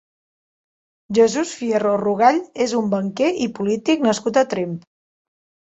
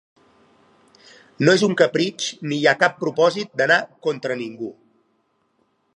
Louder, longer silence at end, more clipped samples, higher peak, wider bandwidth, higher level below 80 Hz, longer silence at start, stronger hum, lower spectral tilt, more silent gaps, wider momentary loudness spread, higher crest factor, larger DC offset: about the same, -19 LUFS vs -20 LUFS; second, 1 s vs 1.25 s; neither; about the same, -2 dBFS vs 0 dBFS; second, 8.2 kHz vs 11 kHz; first, -64 dBFS vs -74 dBFS; second, 1.1 s vs 1.4 s; neither; about the same, -5 dB/octave vs -4.5 dB/octave; neither; second, 6 LU vs 11 LU; about the same, 18 dB vs 22 dB; neither